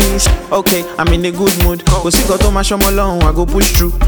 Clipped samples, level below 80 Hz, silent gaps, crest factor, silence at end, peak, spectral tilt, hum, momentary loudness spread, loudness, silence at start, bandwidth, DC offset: under 0.1%; -16 dBFS; none; 12 dB; 0 s; 0 dBFS; -4 dB/octave; none; 2 LU; -12 LUFS; 0 s; over 20 kHz; under 0.1%